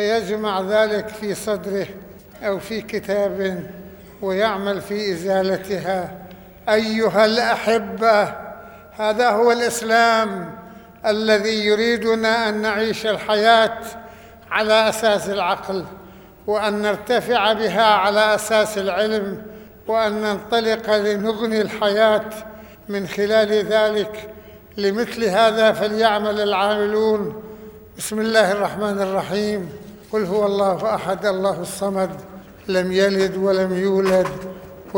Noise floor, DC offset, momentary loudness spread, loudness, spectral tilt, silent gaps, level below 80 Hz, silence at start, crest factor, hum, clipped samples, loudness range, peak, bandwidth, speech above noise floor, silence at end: -40 dBFS; under 0.1%; 17 LU; -19 LUFS; -4 dB/octave; none; -54 dBFS; 0 s; 18 dB; none; under 0.1%; 5 LU; -2 dBFS; over 20 kHz; 20 dB; 0 s